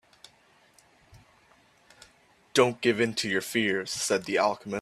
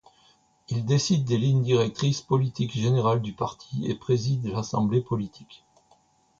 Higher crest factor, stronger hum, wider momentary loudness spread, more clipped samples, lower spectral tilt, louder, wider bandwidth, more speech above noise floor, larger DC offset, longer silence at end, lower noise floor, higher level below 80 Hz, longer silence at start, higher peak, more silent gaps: first, 24 dB vs 16 dB; neither; second, 4 LU vs 8 LU; neither; second, -3.5 dB/octave vs -6.5 dB/octave; about the same, -26 LUFS vs -26 LUFS; first, 15.5 kHz vs 7.6 kHz; about the same, 35 dB vs 38 dB; neither; second, 0 s vs 0.85 s; about the same, -62 dBFS vs -63 dBFS; second, -70 dBFS vs -58 dBFS; first, 1.15 s vs 0.7 s; first, -6 dBFS vs -10 dBFS; neither